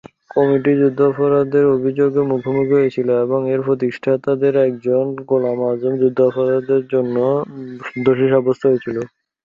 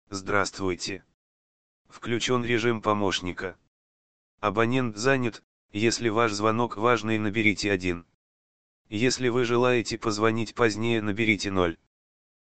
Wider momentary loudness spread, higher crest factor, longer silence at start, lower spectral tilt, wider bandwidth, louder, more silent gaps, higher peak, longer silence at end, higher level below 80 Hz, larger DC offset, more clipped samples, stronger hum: second, 5 LU vs 9 LU; second, 14 dB vs 22 dB; first, 0.35 s vs 0.05 s; first, -9.5 dB/octave vs -4.5 dB/octave; second, 5.2 kHz vs 9 kHz; first, -17 LUFS vs -26 LUFS; second, none vs 1.14-1.85 s, 3.68-4.38 s, 5.44-5.69 s, 8.14-8.85 s; first, -2 dBFS vs -6 dBFS; second, 0.4 s vs 0.6 s; second, -60 dBFS vs -54 dBFS; second, under 0.1% vs 0.9%; neither; neither